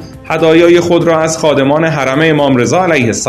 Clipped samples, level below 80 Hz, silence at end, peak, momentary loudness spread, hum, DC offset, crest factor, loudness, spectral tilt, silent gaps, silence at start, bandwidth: 0.4%; -42 dBFS; 0 s; 0 dBFS; 4 LU; none; 0.2%; 10 dB; -9 LUFS; -5 dB/octave; none; 0 s; 13.5 kHz